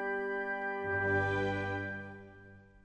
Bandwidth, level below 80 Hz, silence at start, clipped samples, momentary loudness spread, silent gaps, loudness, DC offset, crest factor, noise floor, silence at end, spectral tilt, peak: 9.2 kHz; -62 dBFS; 0 s; under 0.1%; 17 LU; none; -34 LUFS; under 0.1%; 14 dB; -56 dBFS; 0.05 s; -7 dB/octave; -20 dBFS